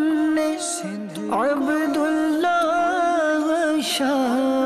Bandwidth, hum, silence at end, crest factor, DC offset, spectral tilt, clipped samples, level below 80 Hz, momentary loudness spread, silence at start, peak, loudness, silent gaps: 14 kHz; none; 0 s; 8 dB; under 0.1%; -3.5 dB/octave; under 0.1%; -62 dBFS; 6 LU; 0 s; -14 dBFS; -21 LUFS; none